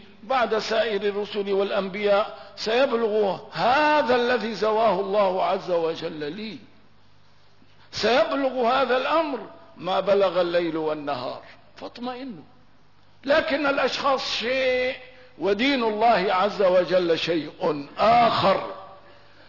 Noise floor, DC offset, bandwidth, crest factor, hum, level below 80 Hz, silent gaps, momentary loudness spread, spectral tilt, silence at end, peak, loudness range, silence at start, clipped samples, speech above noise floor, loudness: -58 dBFS; 0.3%; 6 kHz; 14 dB; 50 Hz at -60 dBFS; -62 dBFS; none; 15 LU; -5 dB/octave; 0.5 s; -10 dBFS; 5 LU; 0.25 s; under 0.1%; 36 dB; -23 LUFS